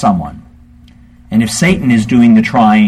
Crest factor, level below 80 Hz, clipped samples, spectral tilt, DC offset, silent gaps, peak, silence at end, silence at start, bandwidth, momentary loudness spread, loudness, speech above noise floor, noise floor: 10 dB; -38 dBFS; under 0.1%; -5.5 dB/octave; under 0.1%; none; 0 dBFS; 0 s; 0 s; 13 kHz; 9 LU; -10 LUFS; 31 dB; -40 dBFS